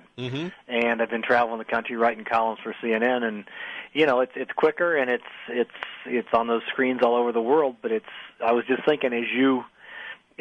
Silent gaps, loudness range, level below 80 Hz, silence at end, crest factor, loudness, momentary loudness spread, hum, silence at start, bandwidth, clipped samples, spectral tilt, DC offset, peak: none; 1 LU; -68 dBFS; 0.25 s; 16 dB; -24 LUFS; 11 LU; none; 0.15 s; 6.6 kHz; under 0.1%; -6.5 dB/octave; under 0.1%; -8 dBFS